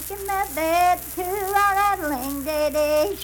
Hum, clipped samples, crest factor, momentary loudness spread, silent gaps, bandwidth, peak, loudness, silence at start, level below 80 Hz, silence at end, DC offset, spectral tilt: none; under 0.1%; 14 dB; 7 LU; none; 19 kHz; -8 dBFS; -22 LUFS; 0 s; -44 dBFS; 0 s; under 0.1%; -3 dB/octave